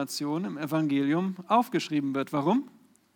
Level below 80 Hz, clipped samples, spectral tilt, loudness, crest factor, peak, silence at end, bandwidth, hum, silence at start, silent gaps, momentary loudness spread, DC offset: -86 dBFS; under 0.1%; -6 dB/octave; -28 LUFS; 18 dB; -10 dBFS; 0.45 s; 19 kHz; none; 0 s; none; 6 LU; under 0.1%